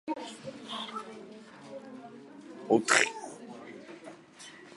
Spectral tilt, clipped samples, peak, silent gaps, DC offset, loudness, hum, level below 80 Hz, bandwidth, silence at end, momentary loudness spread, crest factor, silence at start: -2.5 dB/octave; under 0.1%; -6 dBFS; none; under 0.1%; -29 LUFS; none; -82 dBFS; 11.5 kHz; 0 s; 24 LU; 30 dB; 0.05 s